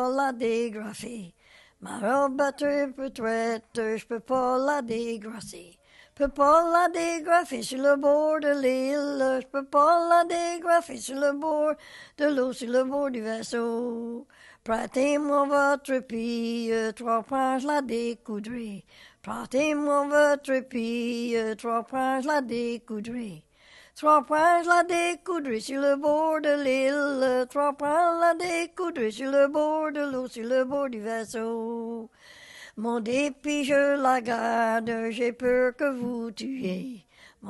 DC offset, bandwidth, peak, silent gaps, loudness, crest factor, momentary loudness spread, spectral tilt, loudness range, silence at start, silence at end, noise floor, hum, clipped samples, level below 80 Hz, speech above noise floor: under 0.1%; 12.5 kHz; -8 dBFS; none; -26 LUFS; 18 dB; 13 LU; -4 dB/octave; 5 LU; 0 s; 0 s; -55 dBFS; none; under 0.1%; -60 dBFS; 29 dB